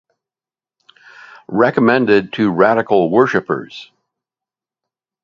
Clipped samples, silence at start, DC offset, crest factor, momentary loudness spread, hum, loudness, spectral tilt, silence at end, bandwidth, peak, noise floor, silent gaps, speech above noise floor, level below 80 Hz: under 0.1%; 1.5 s; under 0.1%; 18 dB; 11 LU; none; -14 LUFS; -7.5 dB/octave; 1.4 s; 7 kHz; 0 dBFS; under -90 dBFS; none; over 76 dB; -58 dBFS